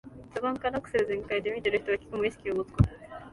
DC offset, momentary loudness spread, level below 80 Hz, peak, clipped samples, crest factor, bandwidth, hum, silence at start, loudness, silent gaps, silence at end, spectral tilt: under 0.1%; 5 LU; -44 dBFS; -8 dBFS; under 0.1%; 22 dB; 11.5 kHz; none; 0.05 s; -30 LUFS; none; 0 s; -7.5 dB/octave